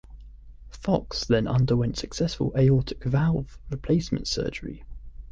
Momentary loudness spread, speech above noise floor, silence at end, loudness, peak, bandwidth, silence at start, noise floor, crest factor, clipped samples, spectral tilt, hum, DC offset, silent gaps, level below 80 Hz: 14 LU; 20 dB; 0.05 s; -26 LUFS; -8 dBFS; 7.8 kHz; 0.05 s; -44 dBFS; 18 dB; under 0.1%; -6.5 dB/octave; none; under 0.1%; none; -40 dBFS